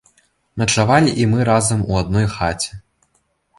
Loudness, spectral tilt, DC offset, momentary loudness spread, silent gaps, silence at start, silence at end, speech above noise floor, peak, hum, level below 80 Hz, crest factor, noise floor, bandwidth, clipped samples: -17 LUFS; -5 dB/octave; under 0.1%; 10 LU; none; 0.55 s; 0.8 s; 48 dB; -2 dBFS; none; -38 dBFS; 16 dB; -65 dBFS; 11.5 kHz; under 0.1%